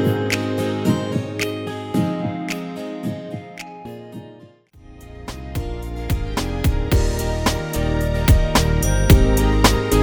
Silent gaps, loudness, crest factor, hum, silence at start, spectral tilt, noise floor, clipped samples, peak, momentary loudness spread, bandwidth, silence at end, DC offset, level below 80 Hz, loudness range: none; -20 LUFS; 18 dB; none; 0 s; -5.5 dB/octave; -46 dBFS; under 0.1%; 0 dBFS; 18 LU; over 20 kHz; 0 s; under 0.1%; -24 dBFS; 13 LU